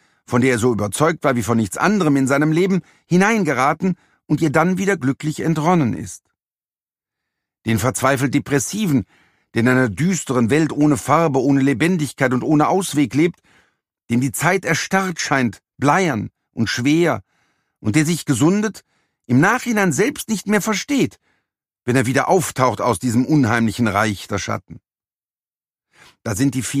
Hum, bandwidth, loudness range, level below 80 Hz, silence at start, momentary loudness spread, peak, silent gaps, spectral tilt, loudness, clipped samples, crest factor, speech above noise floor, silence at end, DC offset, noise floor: none; 15.5 kHz; 4 LU; -54 dBFS; 0.3 s; 8 LU; 0 dBFS; none; -5.5 dB/octave; -18 LUFS; under 0.1%; 18 dB; over 73 dB; 0 s; under 0.1%; under -90 dBFS